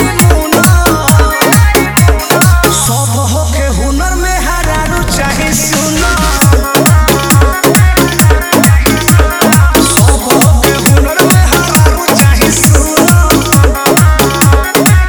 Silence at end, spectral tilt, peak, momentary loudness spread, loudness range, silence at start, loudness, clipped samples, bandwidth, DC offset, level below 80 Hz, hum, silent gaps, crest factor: 0 s; -4.5 dB/octave; 0 dBFS; 6 LU; 3 LU; 0 s; -8 LUFS; 2%; over 20 kHz; 0.1%; -14 dBFS; none; none; 8 dB